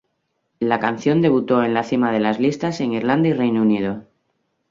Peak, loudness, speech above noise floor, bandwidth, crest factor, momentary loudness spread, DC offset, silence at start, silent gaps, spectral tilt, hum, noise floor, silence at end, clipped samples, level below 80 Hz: -2 dBFS; -19 LUFS; 53 dB; 7.6 kHz; 18 dB; 6 LU; under 0.1%; 0.6 s; none; -7 dB/octave; none; -72 dBFS; 0.7 s; under 0.1%; -60 dBFS